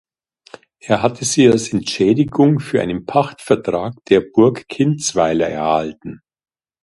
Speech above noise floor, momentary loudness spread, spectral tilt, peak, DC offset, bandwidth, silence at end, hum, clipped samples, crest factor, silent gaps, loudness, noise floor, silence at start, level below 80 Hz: 28 dB; 8 LU; -5.5 dB/octave; 0 dBFS; under 0.1%; 11.5 kHz; 0.65 s; none; under 0.1%; 16 dB; none; -16 LUFS; -43 dBFS; 0.85 s; -50 dBFS